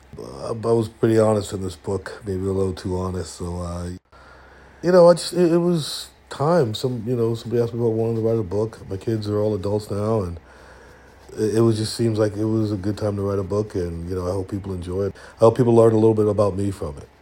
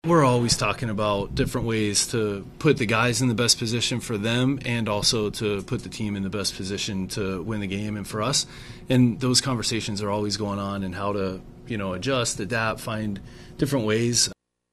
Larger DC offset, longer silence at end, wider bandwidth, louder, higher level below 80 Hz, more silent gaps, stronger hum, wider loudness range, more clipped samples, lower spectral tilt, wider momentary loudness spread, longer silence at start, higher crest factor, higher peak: neither; second, 0.15 s vs 0.4 s; first, 16.5 kHz vs 14.5 kHz; first, -21 LUFS vs -24 LUFS; about the same, -50 dBFS vs -46 dBFS; neither; neither; about the same, 5 LU vs 5 LU; neither; first, -7 dB/octave vs -4 dB/octave; first, 14 LU vs 9 LU; about the same, 0.15 s vs 0.05 s; about the same, 20 dB vs 20 dB; about the same, -2 dBFS vs -4 dBFS